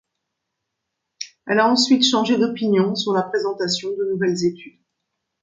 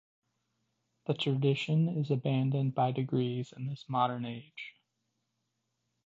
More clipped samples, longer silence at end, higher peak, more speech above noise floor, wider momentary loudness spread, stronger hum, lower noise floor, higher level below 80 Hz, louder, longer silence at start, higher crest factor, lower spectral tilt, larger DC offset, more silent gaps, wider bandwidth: neither; second, 0.75 s vs 1.35 s; first, -2 dBFS vs -16 dBFS; first, 60 dB vs 51 dB; about the same, 13 LU vs 14 LU; neither; about the same, -79 dBFS vs -82 dBFS; first, -68 dBFS vs -76 dBFS; first, -19 LUFS vs -32 LUFS; about the same, 1.2 s vs 1.1 s; about the same, 18 dB vs 18 dB; second, -4 dB/octave vs -8 dB/octave; neither; neither; first, 9.4 kHz vs 7.6 kHz